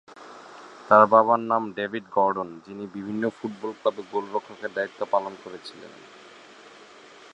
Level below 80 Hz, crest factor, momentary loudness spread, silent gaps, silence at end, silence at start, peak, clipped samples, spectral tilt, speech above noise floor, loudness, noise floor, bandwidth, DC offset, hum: -72 dBFS; 24 dB; 27 LU; none; 1.4 s; 0.15 s; -2 dBFS; under 0.1%; -6.5 dB/octave; 24 dB; -24 LUFS; -49 dBFS; 9.8 kHz; under 0.1%; none